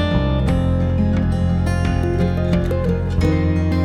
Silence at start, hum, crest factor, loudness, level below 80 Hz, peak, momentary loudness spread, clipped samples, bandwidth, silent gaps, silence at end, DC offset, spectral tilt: 0 s; none; 12 dB; -19 LUFS; -24 dBFS; -4 dBFS; 1 LU; under 0.1%; 11 kHz; none; 0 s; under 0.1%; -8 dB/octave